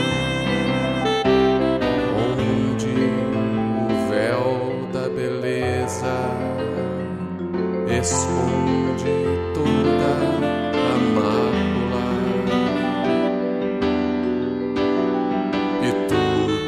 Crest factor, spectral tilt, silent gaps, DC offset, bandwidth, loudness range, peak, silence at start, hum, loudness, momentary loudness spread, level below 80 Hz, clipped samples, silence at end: 14 dB; -5.5 dB/octave; none; under 0.1%; 13.5 kHz; 3 LU; -6 dBFS; 0 s; none; -21 LUFS; 5 LU; -44 dBFS; under 0.1%; 0 s